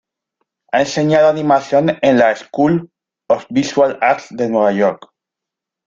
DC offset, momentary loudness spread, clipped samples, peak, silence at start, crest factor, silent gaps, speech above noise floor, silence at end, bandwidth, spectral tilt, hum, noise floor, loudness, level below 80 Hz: under 0.1%; 7 LU; under 0.1%; -2 dBFS; 0.75 s; 14 dB; none; 70 dB; 0.9 s; 7.6 kHz; -6 dB/octave; none; -83 dBFS; -15 LUFS; -56 dBFS